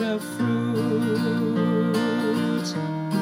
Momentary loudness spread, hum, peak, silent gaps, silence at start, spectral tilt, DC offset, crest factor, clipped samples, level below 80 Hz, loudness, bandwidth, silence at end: 4 LU; none; -10 dBFS; none; 0 s; -6.5 dB/octave; under 0.1%; 12 dB; under 0.1%; -68 dBFS; -24 LUFS; 16 kHz; 0 s